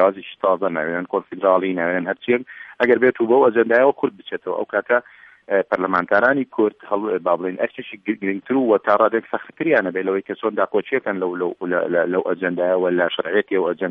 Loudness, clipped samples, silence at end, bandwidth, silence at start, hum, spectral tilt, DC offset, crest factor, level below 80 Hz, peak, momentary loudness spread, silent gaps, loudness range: -20 LUFS; under 0.1%; 0 s; 5.6 kHz; 0 s; none; -8 dB/octave; under 0.1%; 18 dB; -68 dBFS; -2 dBFS; 9 LU; none; 3 LU